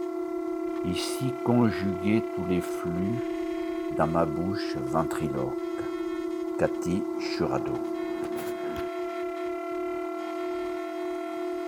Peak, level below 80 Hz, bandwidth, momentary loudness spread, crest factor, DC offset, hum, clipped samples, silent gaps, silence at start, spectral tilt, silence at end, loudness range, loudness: -8 dBFS; -56 dBFS; 19 kHz; 7 LU; 20 dB; under 0.1%; none; under 0.1%; none; 0 s; -6.5 dB/octave; 0 s; 4 LU; -30 LUFS